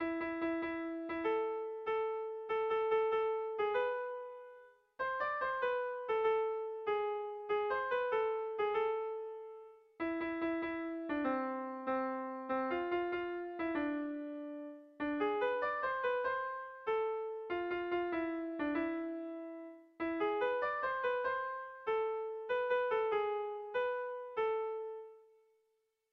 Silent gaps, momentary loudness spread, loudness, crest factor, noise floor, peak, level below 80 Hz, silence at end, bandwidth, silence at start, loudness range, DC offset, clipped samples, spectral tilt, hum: none; 9 LU; -37 LUFS; 14 dB; -81 dBFS; -24 dBFS; -72 dBFS; 0.9 s; 5.4 kHz; 0 s; 3 LU; under 0.1%; under 0.1%; -2 dB/octave; none